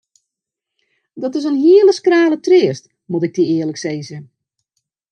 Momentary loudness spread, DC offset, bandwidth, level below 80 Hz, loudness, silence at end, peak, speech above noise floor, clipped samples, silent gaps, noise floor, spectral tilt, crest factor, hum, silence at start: 17 LU; under 0.1%; 9 kHz; -72 dBFS; -14 LUFS; 0.85 s; -2 dBFS; 68 dB; under 0.1%; none; -82 dBFS; -6 dB/octave; 16 dB; none; 1.15 s